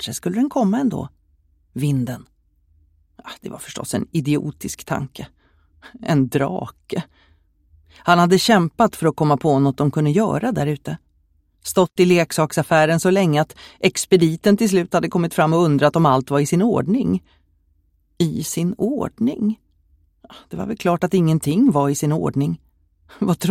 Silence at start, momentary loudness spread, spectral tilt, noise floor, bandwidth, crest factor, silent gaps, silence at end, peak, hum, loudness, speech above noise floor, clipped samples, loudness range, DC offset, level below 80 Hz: 0 s; 15 LU; -6 dB/octave; -61 dBFS; 16 kHz; 20 dB; none; 0 s; 0 dBFS; none; -19 LUFS; 43 dB; under 0.1%; 9 LU; under 0.1%; -52 dBFS